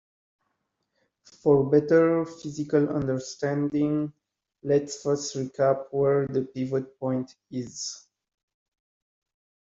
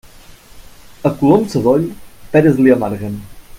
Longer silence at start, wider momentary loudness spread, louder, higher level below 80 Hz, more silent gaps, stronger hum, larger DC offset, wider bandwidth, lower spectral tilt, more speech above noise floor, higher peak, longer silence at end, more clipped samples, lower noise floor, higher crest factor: first, 1.45 s vs 0.55 s; about the same, 14 LU vs 14 LU; second, -26 LUFS vs -14 LUFS; second, -64 dBFS vs -42 dBFS; neither; neither; neither; second, 7.8 kHz vs 16 kHz; second, -6 dB/octave vs -8 dB/octave; first, 53 dB vs 27 dB; second, -8 dBFS vs 0 dBFS; first, 1.65 s vs 0 s; neither; first, -78 dBFS vs -40 dBFS; about the same, 18 dB vs 16 dB